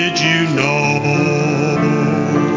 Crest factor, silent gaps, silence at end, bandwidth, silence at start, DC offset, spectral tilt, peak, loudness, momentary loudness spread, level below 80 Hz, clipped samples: 14 dB; none; 0 s; 7.6 kHz; 0 s; under 0.1%; -5.5 dB/octave; 0 dBFS; -15 LUFS; 2 LU; -50 dBFS; under 0.1%